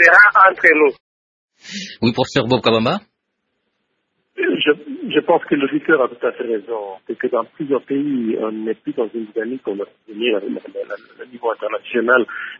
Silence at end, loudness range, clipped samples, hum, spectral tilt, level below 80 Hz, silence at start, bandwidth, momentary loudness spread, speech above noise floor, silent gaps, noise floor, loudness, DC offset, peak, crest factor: 0 s; 6 LU; under 0.1%; none; -5.5 dB/octave; -58 dBFS; 0 s; 7.6 kHz; 17 LU; 56 dB; 1.00-1.48 s; -73 dBFS; -17 LUFS; under 0.1%; 0 dBFS; 18 dB